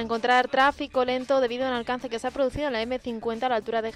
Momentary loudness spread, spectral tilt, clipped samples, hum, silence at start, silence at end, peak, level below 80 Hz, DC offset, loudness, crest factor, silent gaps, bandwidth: 8 LU; -4.5 dB/octave; under 0.1%; none; 0 s; 0 s; -10 dBFS; -52 dBFS; under 0.1%; -25 LUFS; 16 dB; none; 11.5 kHz